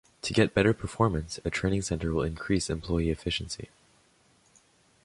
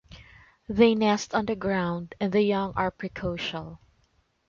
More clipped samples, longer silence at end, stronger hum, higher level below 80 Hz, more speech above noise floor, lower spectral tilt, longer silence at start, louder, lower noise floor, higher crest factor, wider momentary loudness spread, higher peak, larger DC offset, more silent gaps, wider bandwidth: neither; first, 1.4 s vs 0.7 s; neither; first, -44 dBFS vs -52 dBFS; second, 36 dB vs 42 dB; about the same, -5.5 dB/octave vs -5.5 dB/octave; first, 0.25 s vs 0.1 s; second, -29 LUFS vs -26 LUFS; second, -64 dBFS vs -68 dBFS; about the same, 22 dB vs 20 dB; second, 8 LU vs 12 LU; about the same, -8 dBFS vs -6 dBFS; neither; neither; first, 11.5 kHz vs 7.4 kHz